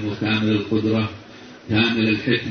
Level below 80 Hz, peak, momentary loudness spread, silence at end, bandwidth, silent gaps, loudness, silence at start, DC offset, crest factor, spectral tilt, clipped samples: -52 dBFS; -4 dBFS; 20 LU; 0 s; 6.6 kHz; none; -20 LUFS; 0 s; under 0.1%; 16 dB; -7 dB/octave; under 0.1%